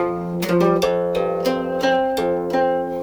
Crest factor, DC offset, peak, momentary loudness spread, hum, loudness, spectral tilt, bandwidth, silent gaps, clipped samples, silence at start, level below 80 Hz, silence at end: 14 dB; under 0.1%; -6 dBFS; 4 LU; none; -20 LUFS; -6 dB/octave; over 20 kHz; none; under 0.1%; 0 s; -50 dBFS; 0 s